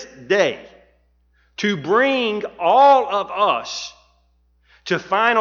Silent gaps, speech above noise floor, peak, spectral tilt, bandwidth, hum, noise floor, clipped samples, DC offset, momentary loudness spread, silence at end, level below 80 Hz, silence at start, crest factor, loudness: none; 43 dB; -2 dBFS; -4 dB/octave; 7.4 kHz; none; -60 dBFS; under 0.1%; under 0.1%; 17 LU; 0 s; -60 dBFS; 0 s; 16 dB; -18 LUFS